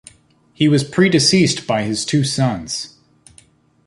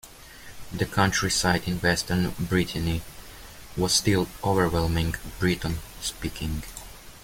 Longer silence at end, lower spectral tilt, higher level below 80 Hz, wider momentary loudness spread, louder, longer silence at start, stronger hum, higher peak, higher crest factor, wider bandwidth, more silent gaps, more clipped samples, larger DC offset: first, 1 s vs 0 s; about the same, -4.5 dB/octave vs -4 dB/octave; second, -52 dBFS vs -42 dBFS; second, 12 LU vs 21 LU; first, -16 LUFS vs -26 LUFS; first, 0.6 s vs 0.05 s; neither; first, -2 dBFS vs -6 dBFS; about the same, 16 dB vs 20 dB; second, 11.5 kHz vs 17 kHz; neither; neither; neither